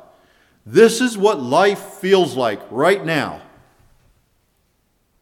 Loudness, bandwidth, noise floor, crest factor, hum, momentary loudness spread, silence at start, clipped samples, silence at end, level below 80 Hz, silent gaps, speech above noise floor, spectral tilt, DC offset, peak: -17 LUFS; 16.5 kHz; -64 dBFS; 18 dB; none; 9 LU; 0.65 s; under 0.1%; 1.85 s; -62 dBFS; none; 48 dB; -4.5 dB/octave; under 0.1%; 0 dBFS